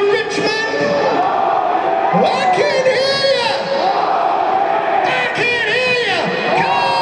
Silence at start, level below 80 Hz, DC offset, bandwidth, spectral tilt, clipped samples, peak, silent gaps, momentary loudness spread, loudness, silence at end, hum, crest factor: 0 s; -56 dBFS; under 0.1%; 10.5 kHz; -4 dB/octave; under 0.1%; -2 dBFS; none; 3 LU; -15 LUFS; 0 s; none; 14 dB